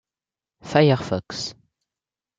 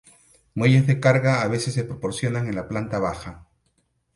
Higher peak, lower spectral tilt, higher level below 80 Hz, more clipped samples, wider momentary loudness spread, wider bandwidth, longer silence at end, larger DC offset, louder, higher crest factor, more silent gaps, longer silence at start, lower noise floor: about the same, -4 dBFS vs -4 dBFS; about the same, -6 dB/octave vs -6.5 dB/octave; second, -62 dBFS vs -50 dBFS; neither; about the same, 13 LU vs 11 LU; second, 7.8 kHz vs 11.5 kHz; about the same, 0.85 s vs 0.75 s; neither; about the same, -22 LUFS vs -22 LUFS; about the same, 20 dB vs 18 dB; neither; about the same, 0.65 s vs 0.55 s; first, under -90 dBFS vs -69 dBFS